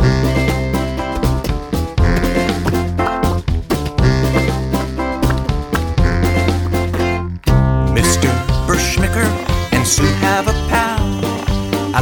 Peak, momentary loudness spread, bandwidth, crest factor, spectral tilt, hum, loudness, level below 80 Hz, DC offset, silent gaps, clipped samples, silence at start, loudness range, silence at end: -2 dBFS; 6 LU; over 20 kHz; 14 dB; -5 dB/octave; none; -16 LUFS; -22 dBFS; under 0.1%; none; under 0.1%; 0 s; 2 LU; 0 s